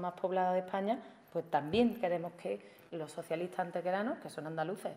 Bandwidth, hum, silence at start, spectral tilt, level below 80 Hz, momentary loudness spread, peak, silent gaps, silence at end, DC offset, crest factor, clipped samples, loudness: 16 kHz; none; 0 s; -6.5 dB/octave; -72 dBFS; 11 LU; -18 dBFS; none; 0 s; under 0.1%; 18 dB; under 0.1%; -36 LUFS